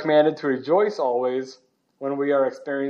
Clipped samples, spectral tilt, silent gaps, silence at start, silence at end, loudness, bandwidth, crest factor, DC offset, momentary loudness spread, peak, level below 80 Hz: under 0.1%; -6.5 dB/octave; none; 0 s; 0 s; -23 LUFS; 7.2 kHz; 16 dB; under 0.1%; 11 LU; -6 dBFS; -84 dBFS